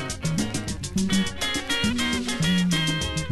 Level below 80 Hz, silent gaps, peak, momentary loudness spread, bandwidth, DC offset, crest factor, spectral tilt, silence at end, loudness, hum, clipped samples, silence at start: -40 dBFS; none; -12 dBFS; 5 LU; 12.5 kHz; under 0.1%; 14 dB; -4 dB/octave; 0 s; -24 LUFS; none; under 0.1%; 0 s